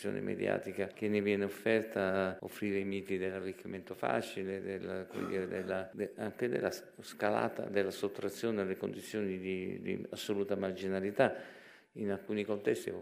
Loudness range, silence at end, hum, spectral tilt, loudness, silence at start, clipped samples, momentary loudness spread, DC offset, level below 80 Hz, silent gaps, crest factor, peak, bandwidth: 3 LU; 0 s; none; -6 dB/octave; -36 LUFS; 0 s; under 0.1%; 9 LU; under 0.1%; -78 dBFS; none; 24 dB; -12 dBFS; 15.5 kHz